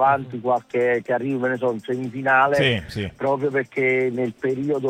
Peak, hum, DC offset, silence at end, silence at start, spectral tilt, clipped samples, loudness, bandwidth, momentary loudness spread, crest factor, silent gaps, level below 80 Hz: -6 dBFS; none; under 0.1%; 0 s; 0 s; -6.5 dB/octave; under 0.1%; -22 LUFS; 13.5 kHz; 8 LU; 16 dB; none; -56 dBFS